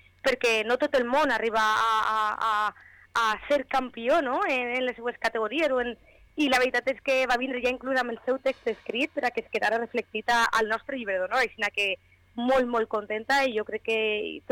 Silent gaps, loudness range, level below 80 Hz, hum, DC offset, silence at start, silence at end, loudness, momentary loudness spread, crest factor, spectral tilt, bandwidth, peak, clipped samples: none; 2 LU; -58 dBFS; none; under 0.1%; 0.25 s; 0.1 s; -26 LUFS; 7 LU; 10 dB; -2.5 dB/octave; 18.5 kHz; -16 dBFS; under 0.1%